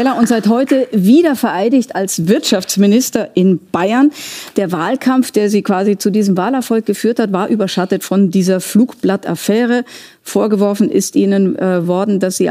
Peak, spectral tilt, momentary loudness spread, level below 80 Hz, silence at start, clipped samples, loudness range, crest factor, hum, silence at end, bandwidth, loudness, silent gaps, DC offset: 0 dBFS; -5.5 dB/octave; 5 LU; -62 dBFS; 0 s; under 0.1%; 2 LU; 12 dB; none; 0 s; 16 kHz; -14 LUFS; none; under 0.1%